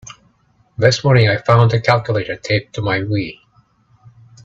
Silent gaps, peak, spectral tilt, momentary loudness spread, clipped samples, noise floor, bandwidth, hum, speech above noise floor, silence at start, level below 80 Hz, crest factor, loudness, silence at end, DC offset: none; 0 dBFS; -6 dB/octave; 9 LU; under 0.1%; -57 dBFS; 7.8 kHz; none; 42 dB; 0.05 s; -48 dBFS; 18 dB; -16 LUFS; 1.1 s; under 0.1%